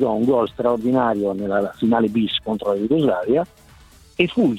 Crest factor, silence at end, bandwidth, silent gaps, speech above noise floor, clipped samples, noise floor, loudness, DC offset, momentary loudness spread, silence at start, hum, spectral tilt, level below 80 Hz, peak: 20 dB; 0 s; 13 kHz; none; 29 dB; under 0.1%; -48 dBFS; -20 LUFS; under 0.1%; 4 LU; 0 s; none; -7.5 dB/octave; -52 dBFS; 0 dBFS